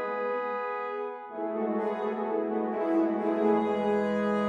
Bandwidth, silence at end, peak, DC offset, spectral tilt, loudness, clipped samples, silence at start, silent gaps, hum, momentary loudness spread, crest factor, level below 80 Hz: 8 kHz; 0 s; -12 dBFS; under 0.1%; -8 dB/octave; -29 LUFS; under 0.1%; 0 s; none; none; 8 LU; 16 dB; -70 dBFS